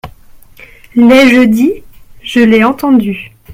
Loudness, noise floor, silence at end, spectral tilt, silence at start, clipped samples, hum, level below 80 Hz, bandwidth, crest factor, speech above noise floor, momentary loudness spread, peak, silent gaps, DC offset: -8 LUFS; -36 dBFS; 0 s; -5.5 dB/octave; 0.05 s; 0.5%; none; -40 dBFS; 15.5 kHz; 10 dB; 29 dB; 17 LU; 0 dBFS; none; under 0.1%